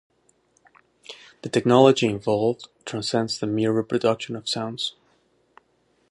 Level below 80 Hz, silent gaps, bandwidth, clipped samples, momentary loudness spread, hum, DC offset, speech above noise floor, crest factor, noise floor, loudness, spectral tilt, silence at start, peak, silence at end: -64 dBFS; none; 11.5 kHz; under 0.1%; 18 LU; none; under 0.1%; 44 dB; 22 dB; -66 dBFS; -23 LUFS; -5.5 dB/octave; 1.1 s; -2 dBFS; 1.2 s